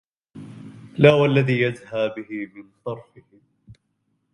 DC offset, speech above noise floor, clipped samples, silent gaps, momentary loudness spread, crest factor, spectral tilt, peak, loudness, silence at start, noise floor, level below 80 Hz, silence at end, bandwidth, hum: under 0.1%; 51 dB; under 0.1%; none; 25 LU; 24 dB; -7.5 dB/octave; 0 dBFS; -20 LUFS; 0.35 s; -72 dBFS; -60 dBFS; 0.6 s; 10 kHz; none